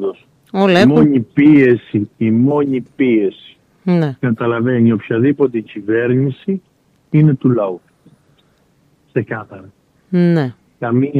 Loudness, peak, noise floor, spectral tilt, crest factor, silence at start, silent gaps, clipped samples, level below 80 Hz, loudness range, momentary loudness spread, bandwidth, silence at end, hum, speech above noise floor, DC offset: -15 LUFS; -2 dBFS; -56 dBFS; -9 dB/octave; 14 dB; 0 s; none; under 0.1%; -56 dBFS; 7 LU; 14 LU; 7.4 kHz; 0 s; none; 42 dB; under 0.1%